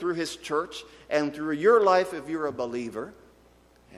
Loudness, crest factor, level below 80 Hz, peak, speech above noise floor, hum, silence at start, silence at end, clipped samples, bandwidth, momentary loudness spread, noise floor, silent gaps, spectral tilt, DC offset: -26 LUFS; 18 dB; -64 dBFS; -8 dBFS; 32 dB; none; 0 s; 0 s; under 0.1%; 14.5 kHz; 17 LU; -58 dBFS; none; -4.5 dB/octave; under 0.1%